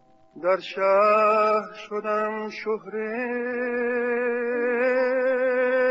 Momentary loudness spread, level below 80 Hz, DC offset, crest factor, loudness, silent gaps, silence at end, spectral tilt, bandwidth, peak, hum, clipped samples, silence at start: 11 LU; -74 dBFS; under 0.1%; 14 dB; -24 LUFS; none; 0 s; -2.5 dB/octave; 7.8 kHz; -10 dBFS; none; under 0.1%; 0.35 s